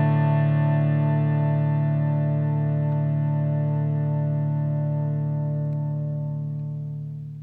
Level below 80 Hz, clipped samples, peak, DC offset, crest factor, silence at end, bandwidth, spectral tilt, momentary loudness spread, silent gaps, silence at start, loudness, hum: -62 dBFS; under 0.1%; -12 dBFS; under 0.1%; 12 dB; 0 s; 3.5 kHz; -12 dB/octave; 9 LU; none; 0 s; -24 LUFS; none